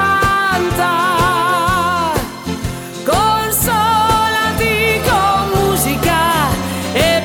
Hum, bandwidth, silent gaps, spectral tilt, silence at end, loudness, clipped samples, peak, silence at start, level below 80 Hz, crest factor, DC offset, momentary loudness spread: none; 18 kHz; none; -4 dB/octave; 0 s; -14 LUFS; under 0.1%; -2 dBFS; 0 s; -32 dBFS; 12 dB; under 0.1%; 7 LU